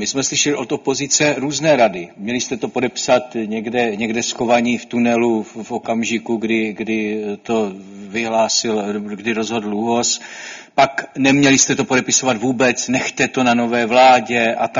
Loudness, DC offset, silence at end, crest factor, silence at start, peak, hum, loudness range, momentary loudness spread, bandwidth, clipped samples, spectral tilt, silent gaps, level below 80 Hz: -17 LUFS; under 0.1%; 0 s; 18 dB; 0 s; 0 dBFS; none; 5 LU; 10 LU; 7.6 kHz; under 0.1%; -3 dB/octave; none; -56 dBFS